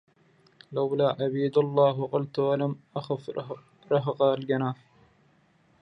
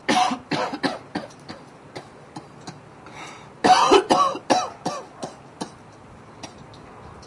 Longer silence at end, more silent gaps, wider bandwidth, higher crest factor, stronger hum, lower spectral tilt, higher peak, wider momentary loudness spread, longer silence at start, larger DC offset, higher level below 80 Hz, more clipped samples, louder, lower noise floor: first, 1.05 s vs 0 s; neither; second, 6 kHz vs 11.5 kHz; about the same, 18 dB vs 20 dB; neither; first, -9 dB/octave vs -3.5 dB/octave; second, -10 dBFS vs -4 dBFS; second, 13 LU vs 25 LU; first, 0.7 s vs 0.1 s; neither; second, -74 dBFS vs -60 dBFS; neither; second, -27 LUFS vs -21 LUFS; first, -64 dBFS vs -45 dBFS